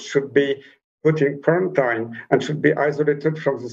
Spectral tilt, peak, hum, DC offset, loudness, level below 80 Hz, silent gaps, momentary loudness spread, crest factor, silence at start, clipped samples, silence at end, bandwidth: -6.5 dB/octave; 0 dBFS; none; under 0.1%; -21 LUFS; -68 dBFS; 0.84-0.98 s; 5 LU; 20 dB; 0 s; under 0.1%; 0 s; 7.8 kHz